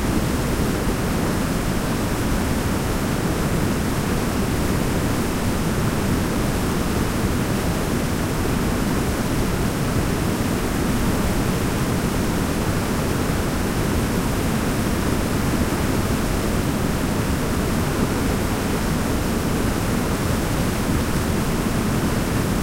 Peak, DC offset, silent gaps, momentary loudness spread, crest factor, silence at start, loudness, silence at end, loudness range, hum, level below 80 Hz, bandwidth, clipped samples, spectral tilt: -6 dBFS; under 0.1%; none; 1 LU; 14 dB; 0 s; -22 LUFS; 0 s; 0 LU; none; -28 dBFS; 16 kHz; under 0.1%; -5.5 dB/octave